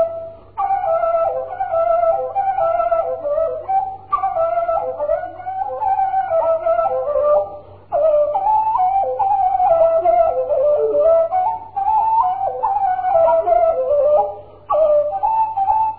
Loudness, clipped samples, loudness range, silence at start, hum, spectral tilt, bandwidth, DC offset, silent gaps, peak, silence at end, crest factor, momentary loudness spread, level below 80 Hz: -17 LUFS; under 0.1%; 4 LU; 0 s; none; -10 dB/octave; 4.4 kHz; 0.3%; none; -4 dBFS; 0 s; 12 dB; 7 LU; -48 dBFS